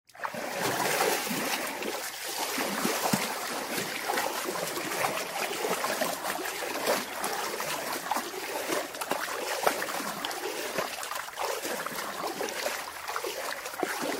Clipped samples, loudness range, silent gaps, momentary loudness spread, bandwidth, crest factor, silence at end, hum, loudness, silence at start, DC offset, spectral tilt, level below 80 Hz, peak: under 0.1%; 4 LU; none; 6 LU; 16.5 kHz; 26 dB; 0 s; none; -31 LUFS; 0.15 s; under 0.1%; -2 dB/octave; -70 dBFS; -8 dBFS